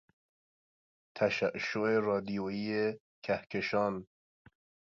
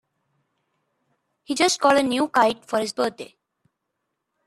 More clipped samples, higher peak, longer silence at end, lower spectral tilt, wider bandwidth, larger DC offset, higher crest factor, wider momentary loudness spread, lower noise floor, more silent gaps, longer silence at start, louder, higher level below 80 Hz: neither; second, -14 dBFS vs -4 dBFS; second, 0.8 s vs 1.2 s; first, -6 dB/octave vs -2.5 dB/octave; second, 7.4 kHz vs 14.5 kHz; neither; about the same, 20 dB vs 20 dB; second, 6 LU vs 12 LU; first, under -90 dBFS vs -79 dBFS; first, 3.00-3.22 s vs none; second, 1.15 s vs 1.5 s; second, -33 LUFS vs -21 LUFS; about the same, -70 dBFS vs -68 dBFS